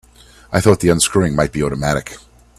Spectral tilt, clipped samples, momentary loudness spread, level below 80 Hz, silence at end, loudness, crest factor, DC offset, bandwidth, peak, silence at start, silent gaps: -5 dB/octave; under 0.1%; 8 LU; -38 dBFS; 0.4 s; -16 LUFS; 16 dB; under 0.1%; 14 kHz; 0 dBFS; 0.5 s; none